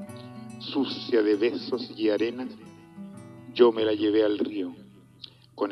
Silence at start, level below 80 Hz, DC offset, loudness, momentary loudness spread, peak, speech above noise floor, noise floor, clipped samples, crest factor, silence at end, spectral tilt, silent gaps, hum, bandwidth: 0 s; -74 dBFS; under 0.1%; -26 LUFS; 23 LU; -6 dBFS; 25 dB; -50 dBFS; under 0.1%; 22 dB; 0 s; -6.5 dB/octave; none; none; 11.5 kHz